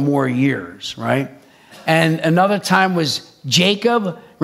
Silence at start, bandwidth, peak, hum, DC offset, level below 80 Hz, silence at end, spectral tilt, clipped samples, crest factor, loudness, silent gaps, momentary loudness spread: 0 s; 15.5 kHz; 0 dBFS; none; under 0.1%; -64 dBFS; 0 s; -5 dB/octave; under 0.1%; 18 dB; -17 LUFS; none; 11 LU